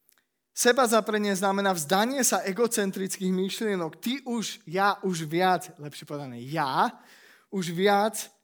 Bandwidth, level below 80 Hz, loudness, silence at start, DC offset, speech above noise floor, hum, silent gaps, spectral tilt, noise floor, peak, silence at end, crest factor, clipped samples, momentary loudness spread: over 20 kHz; -84 dBFS; -26 LUFS; 0.55 s; under 0.1%; 42 dB; none; none; -3.5 dB/octave; -68 dBFS; -8 dBFS; 0.15 s; 20 dB; under 0.1%; 12 LU